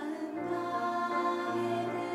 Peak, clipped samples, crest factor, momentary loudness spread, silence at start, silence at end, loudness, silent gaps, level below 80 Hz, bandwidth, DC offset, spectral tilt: -20 dBFS; under 0.1%; 14 dB; 5 LU; 0 s; 0 s; -33 LUFS; none; -80 dBFS; 13 kHz; under 0.1%; -6 dB/octave